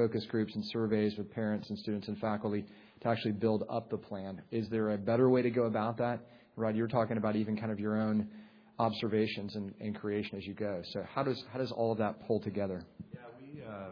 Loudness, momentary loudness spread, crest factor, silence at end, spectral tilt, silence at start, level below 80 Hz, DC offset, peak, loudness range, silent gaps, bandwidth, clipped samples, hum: -34 LUFS; 11 LU; 18 dB; 0 s; -6 dB/octave; 0 s; -70 dBFS; under 0.1%; -16 dBFS; 4 LU; none; 5.4 kHz; under 0.1%; none